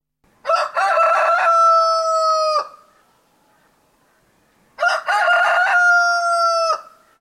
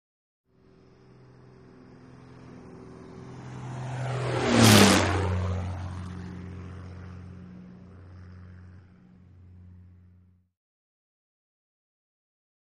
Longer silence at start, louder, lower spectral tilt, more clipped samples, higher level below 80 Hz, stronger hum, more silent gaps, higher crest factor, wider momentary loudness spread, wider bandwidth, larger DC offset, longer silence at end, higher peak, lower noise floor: second, 0.45 s vs 2.2 s; first, -16 LUFS vs -23 LUFS; second, 1.5 dB/octave vs -4.5 dB/octave; neither; second, -70 dBFS vs -52 dBFS; neither; neither; second, 12 dB vs 28 dB; second, 8 LU vs 30 LU; about the same, 13 kHz vs 12.5 kHz; neither; second, 0.4 s vs 3.85 s; second, -6 dBFS vs -2 dBFS; about the same, -59 dBFS vs -59 dBFS